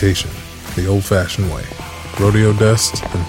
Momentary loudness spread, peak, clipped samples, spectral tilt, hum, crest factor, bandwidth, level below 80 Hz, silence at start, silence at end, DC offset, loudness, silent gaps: 15 LU; -2 dBFS; under 0.1%; -5 dB/octave; none; 14 dB; 16.5 kHz; -34 dBFS; 0 s; 0 s; under 0.1%; -16 LUFS; none